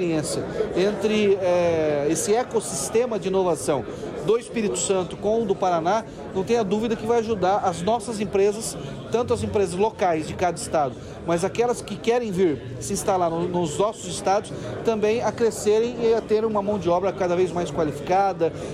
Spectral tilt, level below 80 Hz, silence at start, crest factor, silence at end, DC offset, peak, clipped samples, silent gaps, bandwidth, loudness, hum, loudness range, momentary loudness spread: -5 dB/octave; -50 dBFS; 0 s; 12 dB; 0 s; under 0.1%; -10 dBFS; under 0.1%; none; 15 kHz; -23 LUFS; none; 2 LU; 5 LU